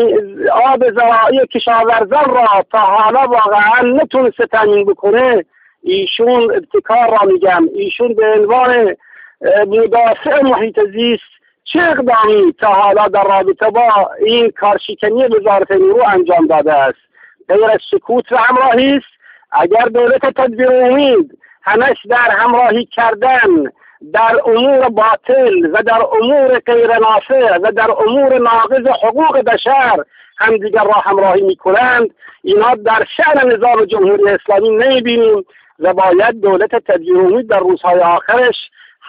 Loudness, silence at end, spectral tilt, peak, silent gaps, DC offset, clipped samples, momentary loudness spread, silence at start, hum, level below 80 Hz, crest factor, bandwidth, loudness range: -11 LUFS; 0 s; -8.5 dB/octave; 0 dBFS; none; under 0.1%; under 0.1%; 5 LU; 0 s; none; -54 dBFS; 10 dB; 5 kHz; 2 LU